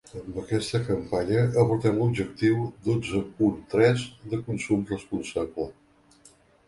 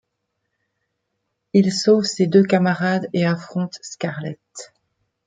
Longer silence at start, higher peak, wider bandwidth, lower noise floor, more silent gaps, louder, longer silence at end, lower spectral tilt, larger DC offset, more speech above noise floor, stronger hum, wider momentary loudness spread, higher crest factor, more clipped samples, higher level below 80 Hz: second, 0.15 s vs 1.55 s; second, -6 dBFS vs -2 dBFS; first, 11.5 kHz vs 9.2 kHz; second, -57 dBFS vs -76 dBFS; neither; second, -26 LUFS vs -19 LUFS; first, 0.95 s vs 0.6 s; about the same, -7 dB/octave vs -6 dB/octave; neither; second, 32 dB vs 57 dB; neither; second, 10 LU vs 16 LU; about the same, 20 dB vs 18 dB; neither; first, -52 dBFS vs -66 dBFS